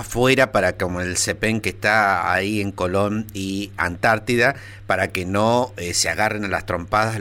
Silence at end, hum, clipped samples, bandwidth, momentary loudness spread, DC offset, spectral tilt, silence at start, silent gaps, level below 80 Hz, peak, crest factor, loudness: 0 s; none; under 0.1%; 17 kHz; 8 LU; under 0.1%; -4 dB/octave; 0 s; none; -44 dBFS; -4 dBFS; 16 dB; -20 LUFS